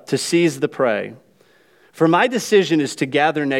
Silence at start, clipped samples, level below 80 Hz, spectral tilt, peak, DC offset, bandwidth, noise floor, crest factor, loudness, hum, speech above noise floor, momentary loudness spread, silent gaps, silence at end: 0.1 s; under 0.1%; -72 dBFS; -4.5 dB/octave; -2 dBFS; under 0.1%; 16 kHz; -55 dBFS; 16 dB; -18 LUFS; none; 37 dB; 5 LU; none; 0 s